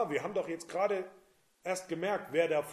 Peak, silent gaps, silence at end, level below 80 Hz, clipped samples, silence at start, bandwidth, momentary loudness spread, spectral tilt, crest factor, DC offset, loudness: -16 dBFS; none; 0 s; -80 dBFS; under 0.1%; 0 s; 15 kHz; 7 LU; -4.5 dB/octave; 18 dB; under 0.1%; -34 LUFS